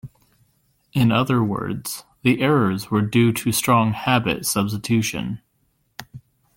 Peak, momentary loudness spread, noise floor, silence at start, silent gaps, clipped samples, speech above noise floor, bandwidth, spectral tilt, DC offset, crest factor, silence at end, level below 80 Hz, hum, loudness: -2 dBFS; 13 LU; -67 dBFS; 0.05 s; none; under 0.1%; 47 dB; 17 kHz; -5 dB/octave; under 0.1%; 18 dB; 0.4 s; -52 dBFS; none; -20 LUFS